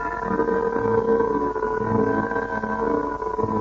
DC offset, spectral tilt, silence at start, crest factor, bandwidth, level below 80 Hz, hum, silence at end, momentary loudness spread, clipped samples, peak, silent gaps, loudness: under 0.1%; -8.5 dB/octave; 0 s; 14 dB; 7.2 kHz; -44 dBFS; none; 0 s; 5 LU; under 0.1%; -8 dBFS; none; -23 LUFS